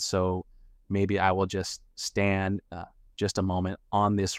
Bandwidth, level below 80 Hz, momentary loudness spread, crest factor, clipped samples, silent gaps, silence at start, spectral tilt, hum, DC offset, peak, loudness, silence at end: 14.5 kHz; -54 dBFS; 11 LU; 18 dB; under 0.1%; none; 0 s; -5 dB/octave; none; under 0.1%; -10 dBFS; -29 LUFS; 0 s